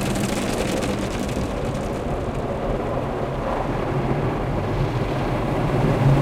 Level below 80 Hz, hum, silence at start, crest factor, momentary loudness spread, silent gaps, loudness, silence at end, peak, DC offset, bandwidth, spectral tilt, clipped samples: -32 dBFS; none; 0 s; 16 dB; 5 LU; none; -24 LUFS; 0 s; -6 dBFS; under 0.1%; 15.5 kHz; -6.5 dB/octave; under 0.1%